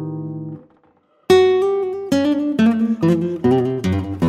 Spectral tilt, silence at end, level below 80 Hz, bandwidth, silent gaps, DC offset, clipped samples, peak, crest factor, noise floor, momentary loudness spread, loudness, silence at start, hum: -7 dB/octave; 0 s; -52 dBFS; 14.5 kHz; none; under 0.1%; under 0.1%; -2 dBFS; 16 dB; -58 dBFS; 14 LU; -17 LUFS; 0 s; none